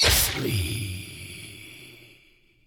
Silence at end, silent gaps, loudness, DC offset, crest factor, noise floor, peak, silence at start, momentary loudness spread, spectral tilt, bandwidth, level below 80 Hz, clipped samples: 0.6 s; none; -25 LUFS; under 0.1%; 20 dB; -59 dBFS; -8 dBFS; 0 s; 23 LU; -2.5 dB/octave; 19.5 kHz; -38 dBFS; under 0.1%